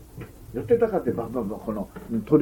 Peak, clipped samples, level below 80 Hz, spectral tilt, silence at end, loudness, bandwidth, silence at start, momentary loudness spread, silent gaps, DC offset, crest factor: -8 dBFS; under 0.1%; -48 dBFS; -9 dB/octave; 0 s; -26 LUFS; 17 kHz; 0 s; 14 LU; none; under 0.1%; 18 dB